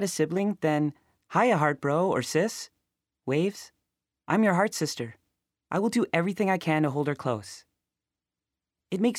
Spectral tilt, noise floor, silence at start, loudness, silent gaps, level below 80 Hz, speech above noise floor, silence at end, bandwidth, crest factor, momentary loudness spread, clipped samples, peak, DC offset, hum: -5.5 dB/octave; -89 dBFS; 0 s; -27 LUFS; none; -74 dBFS; 63 dB; 0 s; 16 kHz; 18 dB; 13 LU; under 0.1%; -10 dBFS; under 0.1%; none